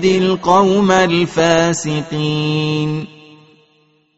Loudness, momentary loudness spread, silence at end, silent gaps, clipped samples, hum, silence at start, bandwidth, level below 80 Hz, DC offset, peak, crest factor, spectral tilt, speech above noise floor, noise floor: -15 LUFS; 8 LU; 1.1 s; none; under 0.1%; none; 0 s; 8 kHz; -50 dBFS; under 0.1%; 0 dBFS; 16 dB; -4.5 dB/octave; 42 dB; -57 dBFS